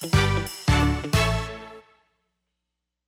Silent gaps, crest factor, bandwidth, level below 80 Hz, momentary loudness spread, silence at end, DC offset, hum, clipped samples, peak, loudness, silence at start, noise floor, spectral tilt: none; 18 dB; 16.5 kHz; -34 dBFS; 16 LU; 1.25 s; under 0.1%; none; under 0.1%; -8 dBFS; -23 LUFS; 0 s; -83 dBFS; -5 dB/octave